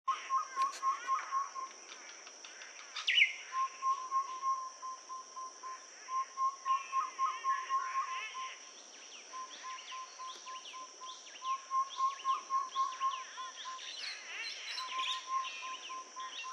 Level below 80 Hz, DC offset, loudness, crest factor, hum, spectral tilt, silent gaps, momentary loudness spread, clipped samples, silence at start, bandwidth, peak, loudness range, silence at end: under -90 dBFS; under 0.1%; -37 LUFS; 24 dB; none; 4 dB/octave; none; 13 LU; under 0.1%; 0.05 s; 11 kHz; -14 dBFS; 7 LU; 0 s